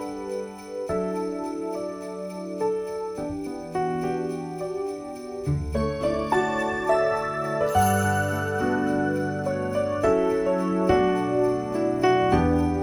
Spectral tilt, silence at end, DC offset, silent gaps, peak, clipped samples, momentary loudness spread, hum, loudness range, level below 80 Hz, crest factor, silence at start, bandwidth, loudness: -6.5 dB/octave; 0 s; under 0.1%; none; -8 dBFS; under 0.1%; 11 LU; none; 7 LU; -44 dBFS; 18 dB; 0 s; 19 kHz; -25 LUFS